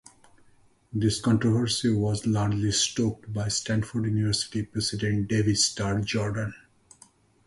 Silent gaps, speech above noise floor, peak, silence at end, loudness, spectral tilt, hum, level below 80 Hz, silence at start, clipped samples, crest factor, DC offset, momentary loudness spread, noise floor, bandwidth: none; 34 dB; -10 dBFS; 0.9 s; -26 LUFS; -4.5 dB/octave; none; -50 dBFS; 0.95 s; under 0.1%; 16 dB; under 0.1%; 6 LU; -59 dBFS; 11.5 kHz